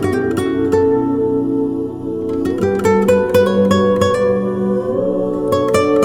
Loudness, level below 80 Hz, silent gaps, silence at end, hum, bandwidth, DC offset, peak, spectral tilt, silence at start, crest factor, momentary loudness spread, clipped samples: -16 LUFS; -44 dBFS; none; 0 s; none; 17.5 kHz; under 0.1%; -2 dBFS; -6.5 dB/octave; 0 s; 14 dB; 6 LU; under 0.1%